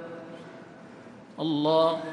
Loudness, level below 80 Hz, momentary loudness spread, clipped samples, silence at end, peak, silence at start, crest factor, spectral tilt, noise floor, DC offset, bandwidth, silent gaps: -25 LUFS; -76 dBFS; 24 LU; under 0.1%; 0 s; -12 dBFS; 0 s; 18 dB; -7 dB/octave; -47 dBFS; under 0.1%; 10.5 kHz; none